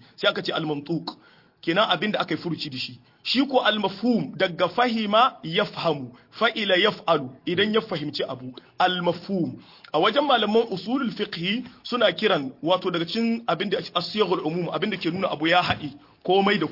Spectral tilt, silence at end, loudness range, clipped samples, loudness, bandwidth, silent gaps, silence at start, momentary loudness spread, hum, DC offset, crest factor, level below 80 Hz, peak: -6 dB/octave; 0 s; 2 LU; under 0.1%; -24 LUFS; 5.8 kHz; none; 0.2 s; 10 LU; none; under 0.1%; 20 dB; -66 dBFS; -6 dBFS